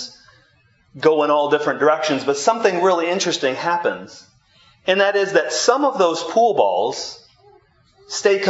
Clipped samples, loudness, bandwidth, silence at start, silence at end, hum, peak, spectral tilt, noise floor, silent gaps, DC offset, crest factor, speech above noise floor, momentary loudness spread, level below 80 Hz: under 0.1%; -18 LUFS; 8 kHz; 0 s; 0 s; none; 0 dBFS; -3 dB/octave; -58 dBFS; none; under 0.1%; 18 dB; 40 dB; 8 LU; -68 dBFS